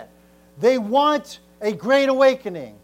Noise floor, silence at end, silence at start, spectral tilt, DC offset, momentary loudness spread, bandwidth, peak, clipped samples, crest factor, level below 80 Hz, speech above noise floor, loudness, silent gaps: -52 dBFS; 0.15 s; 0 s; -4.5 dB/octave; under 0.1%; 12 LU; 15 kHz; -6 dBFS; under 0.1%; 16 dB; -62 dBFS; 33 dB; -19 LUFS; none